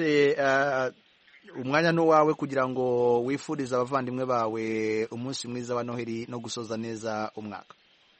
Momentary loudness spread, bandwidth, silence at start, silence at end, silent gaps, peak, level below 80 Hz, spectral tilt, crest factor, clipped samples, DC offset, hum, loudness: 12 LU; 8.4 kHz; 0 s; 0.6 s; none; -8 dBFS; -70 dBFS; -5.5 dB/octave; 20 dB; under 0.1%; under 0.1%; none; -27 LUFS